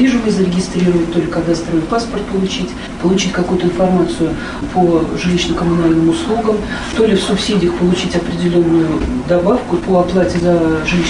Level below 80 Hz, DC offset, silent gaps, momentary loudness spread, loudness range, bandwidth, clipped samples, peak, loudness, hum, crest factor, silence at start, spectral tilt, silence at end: -32 dBFS; under 0.1%; none; 5 LU; 2 LU; 10.5 kHz; under 0.1%; -2 dBFS; -15 LUFS; none; 12 dB; 0 s; -6 dB/octave; 0 s